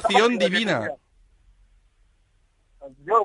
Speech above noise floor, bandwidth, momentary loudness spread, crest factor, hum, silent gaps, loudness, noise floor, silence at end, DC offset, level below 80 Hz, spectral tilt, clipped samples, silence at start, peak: 42 dB; 11 kHz; 22 LU; 20 dB; none; none; -21 LUFS; -63 dBFS; 0 s; under 0.1%; -58 dBFS; -4 dB/octave; under 0.1%; 0 s; -6 dBFS